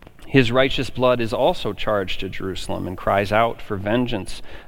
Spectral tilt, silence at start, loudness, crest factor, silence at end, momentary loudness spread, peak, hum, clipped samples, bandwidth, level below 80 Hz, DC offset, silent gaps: -6 dB/octave; 0 s; -21 LUFS; 20 dB; 0 s; 10 LU; -2 dBFS; none; under 0.1%; 16.5 kHz; -36 dBFS; under 0.1%; none